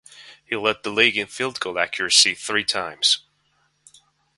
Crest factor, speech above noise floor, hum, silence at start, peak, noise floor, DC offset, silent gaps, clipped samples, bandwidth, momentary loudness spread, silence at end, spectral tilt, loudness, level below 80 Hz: 24 dB; 44 dB; none; 0.15 s; 0 dBFS; -66 dBFS; under 0.1%; none; under 0.1%; 12 kHz; 10 LU; 1.2 s; -0.5 dB/octave; -20 LUFS; -64 dBFS